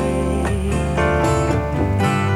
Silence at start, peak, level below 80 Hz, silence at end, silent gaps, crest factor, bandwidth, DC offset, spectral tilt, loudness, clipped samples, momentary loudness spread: 0 s; -4 dBFS; -26 dBFS; 0 s; none; 14 dB; 13.5 kHz; 0.4%; -6.5 dB/octave; -19 LUFS; under 0.1%; 3 LU